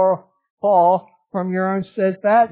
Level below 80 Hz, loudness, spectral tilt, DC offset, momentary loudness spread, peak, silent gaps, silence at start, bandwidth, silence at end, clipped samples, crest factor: -68 dBFS; -19 LUFS; -11 dB/octave; under 0.1%; 11 LU; -4 dBFS; 0.50-0.57 s; 0 s; 4 kHz; 0.05 s; under 0.1%; 14 dB